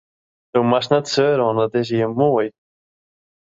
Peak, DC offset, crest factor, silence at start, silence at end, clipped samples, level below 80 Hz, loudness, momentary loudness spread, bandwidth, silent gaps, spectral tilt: -2 dBFS; under 0.1%; 18 dB; 0.55 s; 0.95 s; under 0.1%; -62 dBFS; -19 LUFS; 5 LU; 7.8 kHz; none; -6 dB/octave